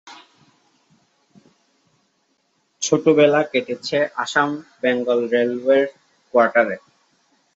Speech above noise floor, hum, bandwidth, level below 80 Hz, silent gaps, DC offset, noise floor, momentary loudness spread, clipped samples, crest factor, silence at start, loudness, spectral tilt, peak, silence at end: 49 dB; none; 8 kHz; -70 dBFS; none; under 0.1%; -67 dBFS; 9 LU; under 0.1%; 20 dB; 0.05 s; -19 LUFS; -4 dB/octave; -2 dBFS; 0.8 s